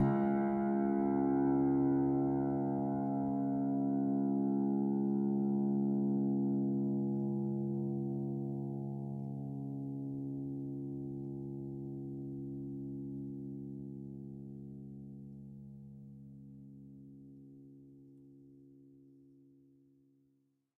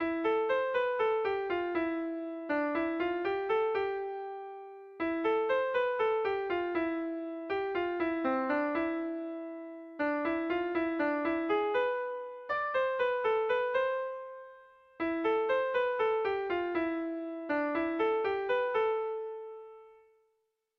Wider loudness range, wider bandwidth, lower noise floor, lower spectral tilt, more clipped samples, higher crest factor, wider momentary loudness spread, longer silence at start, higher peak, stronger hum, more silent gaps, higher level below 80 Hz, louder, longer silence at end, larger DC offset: first, 20 LU vs 2 LU; second, 2.4 kHz vs 6 kHz; about the same, -76 dBFS vs -79 dBFS; first, -12.5 dB/octave vs -6.5 dB/octave; neither; about the same, 16 dB vs 12 dB; first, 21 LU vs 11 LU; about the same, 0 s vs 0 s; about the same, -20 dBFS vs -20 dBFS; neither; neither; about the same, -66 dBFS vs -68 dBFS; second, -36 LUFS vs -32 LUFS; first, 1.95 s vs 0.85 s; neither